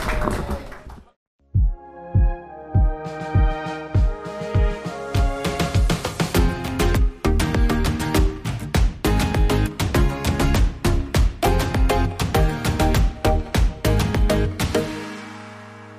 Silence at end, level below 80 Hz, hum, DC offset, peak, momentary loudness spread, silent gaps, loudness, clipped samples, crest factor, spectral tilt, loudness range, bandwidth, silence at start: 0 s; -24 dBFS; none; under 0.1%; -4 dBFS; 9 LU; 1.16-1.39 s; -22 LUFS; under 0.1%; 16 dB; -6 dB/octave; 3 LU; 15.5 kHz; 0 s